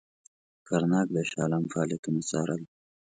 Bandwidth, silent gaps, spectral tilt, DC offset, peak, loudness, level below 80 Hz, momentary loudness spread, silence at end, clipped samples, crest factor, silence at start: 9.4 kHz; 1.99-2.03 s; -6 dB/octave; under 0.1%; -14 dBFS; -29 LUFS; -68 dBFS; 7 LU; 0.5 s; under 0.1%; 16 dB; 0.7 s